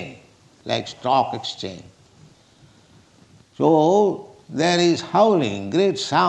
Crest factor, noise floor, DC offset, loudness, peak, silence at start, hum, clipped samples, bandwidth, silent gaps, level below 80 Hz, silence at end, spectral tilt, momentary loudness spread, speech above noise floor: 18 dB; -53 dBFS; under 0.1%; -20 LUFS; -4 dBFS; 0 s; none; under 0.1%; 9.8 kHz; none; -66 dBFS; 0 s; -5 dB/octave; 17 LU; 34 dB